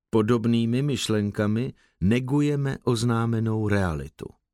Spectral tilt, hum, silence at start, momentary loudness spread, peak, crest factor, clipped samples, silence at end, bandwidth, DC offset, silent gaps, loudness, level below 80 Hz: -6.5 dB/octave; none; 0.15 s; 7 LU; -8 dBFS; 16 dB; under 0.1%; 0.25 s; 13.5 kHz; under 0.1%; none; -25 LUFS; -48 dBFS